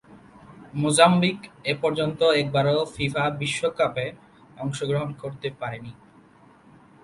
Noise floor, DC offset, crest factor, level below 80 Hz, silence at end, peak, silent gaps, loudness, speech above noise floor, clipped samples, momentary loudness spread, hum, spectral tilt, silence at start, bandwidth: -53 dBFS; under 0.1%; 24 dB; -58 dBFS; 1.1 s; -2 dBFS; none; -24 LUFS; 30 dB; under 0.1%; 16 LU; none; -5 dB/octave; 0.1 s; 11.5 kHz